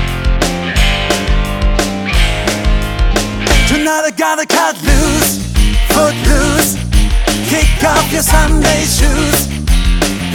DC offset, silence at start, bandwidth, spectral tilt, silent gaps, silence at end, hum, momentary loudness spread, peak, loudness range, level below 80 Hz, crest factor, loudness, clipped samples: under 0.1%; 0 s; 18.5 kHz; -4 dB/octave; none; 0 s; none; 4 LU; 0 dBFS; 2 LU; -14 dBFS; 12 dB; -12 LUFS; under 0.1%